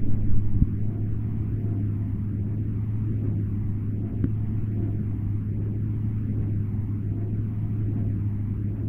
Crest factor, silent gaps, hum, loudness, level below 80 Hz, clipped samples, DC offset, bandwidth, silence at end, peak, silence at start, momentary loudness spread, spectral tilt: 18 dB; none; none; -28 LUFS; -34 dBFS; under 0.1%; 0.4%; 2.6 kHz; 0 s; -6 dBFS; 0 s; 2 LU; -12.5 dB/octave